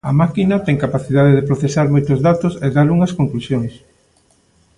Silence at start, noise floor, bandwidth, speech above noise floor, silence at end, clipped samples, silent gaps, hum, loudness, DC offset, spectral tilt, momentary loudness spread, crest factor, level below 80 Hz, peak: 0.05 s; -56 dBFS; 10.5 kHz; 42 dB; 1 s; under 0.1%; none; none; -15 LUFS; under 0.1%; -8 dB/octave; 7 LU; 14 dB; -44 dBFS; 0 dBFS